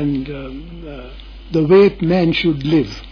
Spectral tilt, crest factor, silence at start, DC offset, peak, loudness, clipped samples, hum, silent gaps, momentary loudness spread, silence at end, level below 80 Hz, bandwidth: -8 dB/octave; 14 dB; 0 s; under 0.1%; -2 dBFS; -15 LUFS; under 0.1%; none; none; 21 LU; 0 s; -36 dBFS; 5.4 kHz